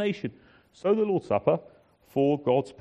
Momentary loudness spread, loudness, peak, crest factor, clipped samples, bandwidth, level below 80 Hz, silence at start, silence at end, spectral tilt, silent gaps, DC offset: 9 LU; -27 LUFS; -8 dBFS; 20 dB; under 0.1%; 9.2 kHz; -66 dBFS; 0 s; 0.1 s; -8 dB/octave; none; under 0.1%